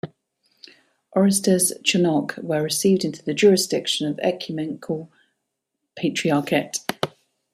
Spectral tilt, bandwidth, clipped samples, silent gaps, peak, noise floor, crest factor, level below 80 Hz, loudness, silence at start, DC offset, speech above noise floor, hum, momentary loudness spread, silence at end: -4 dB/octave; 15 kHz; under 0.1%; none; -4 dBFS; -80 dBFS; 20 dB; -66 dBFS; -21 LUFS; 0.05 s; under 0.1%; 59 dB; none; 12 LU; 0.45 s